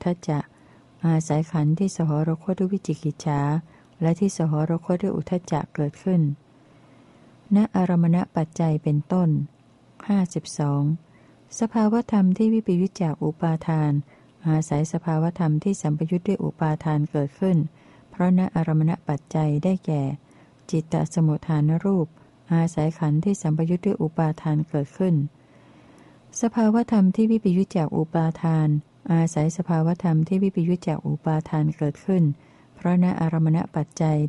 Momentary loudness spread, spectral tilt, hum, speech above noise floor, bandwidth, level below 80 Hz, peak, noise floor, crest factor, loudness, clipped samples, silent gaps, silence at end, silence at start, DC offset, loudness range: 7 LU; -8 dB/octave; none; 31 dB; 11 kHz; -58 dBFS; -10 dBFS; -53 dBFS; 14 dB; -23 LUFS; under 0.1%; none; 0 s; 0.05 s; under 0.1%; 2 LU